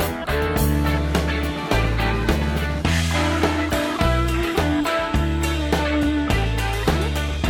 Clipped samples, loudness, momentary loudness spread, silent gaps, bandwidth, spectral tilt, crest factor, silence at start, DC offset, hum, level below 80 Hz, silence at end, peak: under 0.1%; -21 LUFS; 3 LU; none; 19 kHz; -5.5 dB/octave; 16 dB; 0 s; under 0.1%; none; -26 dBFS; 0 s; -4 dBFS